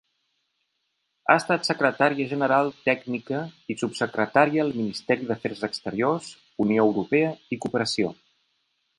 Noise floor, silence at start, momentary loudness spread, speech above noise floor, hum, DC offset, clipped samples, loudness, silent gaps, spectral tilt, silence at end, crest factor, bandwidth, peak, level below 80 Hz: -76 dBFS; 1.3 s; 10 LU; 52 dB; none; under 0.1%; under 0.1%; -24 LUFS; none; -5.5 dB/octave; 0.85 s; 24 dB; 11.5 kHz; -2 dBFS; -66 dBFS